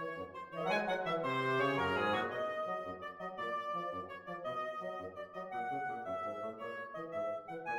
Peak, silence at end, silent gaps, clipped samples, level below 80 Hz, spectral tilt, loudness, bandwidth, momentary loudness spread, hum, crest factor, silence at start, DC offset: -22 dBFS; 0 s; none; under 0.1%; -74 dBFS; -5.5 dB/octave; -38 LUFS; 16.5 kHz; 11 LU; none; 16 dB; 0 s; under 0.1%